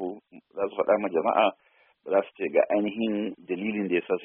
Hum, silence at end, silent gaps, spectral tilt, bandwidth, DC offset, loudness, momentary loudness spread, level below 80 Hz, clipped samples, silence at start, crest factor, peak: none; 0 s; none; -4 dB/octave; 3.7 kHz; under 0.1%; -27 LUFS; 11 LU; -72 dBFS; under 0.1%; 0 s; 18 dB; -8 dBFS